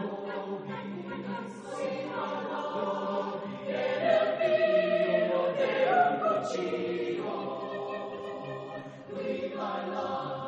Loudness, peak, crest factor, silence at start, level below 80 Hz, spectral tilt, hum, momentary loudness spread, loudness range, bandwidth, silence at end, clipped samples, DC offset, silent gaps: -31 LUFS; -12 dBFS; 18 dB; 0 s; -76 dBFS; -6 dB/octave; none; 13 LU; 8 LU; 9 kHz; 0 s; under 0.1%; under 0.1%; none